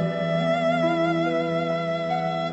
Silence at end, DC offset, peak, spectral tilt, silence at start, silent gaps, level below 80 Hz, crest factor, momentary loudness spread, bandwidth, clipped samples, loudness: 0 s; under 0.1%; -12 dBFS; -7 dB/octave; 0 s; none; -62 dBFS; 12 dB; 4 LU; 8.2 kHz; under 0.1%; -24 LUFS